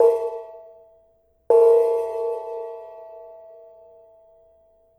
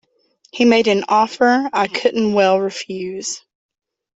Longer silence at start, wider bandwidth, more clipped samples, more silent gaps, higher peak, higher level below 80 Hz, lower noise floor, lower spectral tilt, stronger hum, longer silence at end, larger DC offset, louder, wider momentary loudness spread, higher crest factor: second, 0 s vs 0.55 s; first, 9.2 kHz vs 8.2 kHz; neither; neither; second, -6 dBFS vs -2 dBFS; second, -70 dBFS vs -62 dBFS; about the same, -61 dBFS vs -58 dBFS; about the same, -5 dB/octave vs -4 dB/octave; neither; first, 1.65 s vs 0.8 s; neither; second, -20 LUFS vs -17 LUFS; first, 26 LU vs 12 LU; about the same, 18 dB vs 16 dB